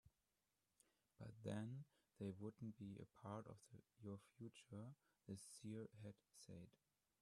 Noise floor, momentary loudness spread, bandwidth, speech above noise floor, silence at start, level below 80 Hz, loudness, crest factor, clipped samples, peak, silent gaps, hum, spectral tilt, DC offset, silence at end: under -90 dBFS; 12 LU; 13 kHz; over 33 dB; 0.05 s; -86 dBFS; -57 LUFS; 20 dB; under 0.1%; -36 dBFS; none; none; -6.5 dB/octave; under 0.1%; 0.5 s